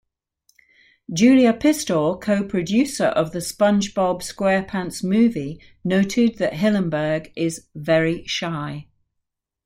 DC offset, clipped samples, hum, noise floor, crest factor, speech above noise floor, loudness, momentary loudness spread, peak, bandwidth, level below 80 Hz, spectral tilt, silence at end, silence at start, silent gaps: under 0.1%; under 0.1%; none; -79 dBFS; 16 dB; 59 dB; -20 LUFS; 10 LU; -4 dBFS; 16.5 kHz; -54 dBFS; -5.5 dB/octave; 0.85 s; 1.1 s; none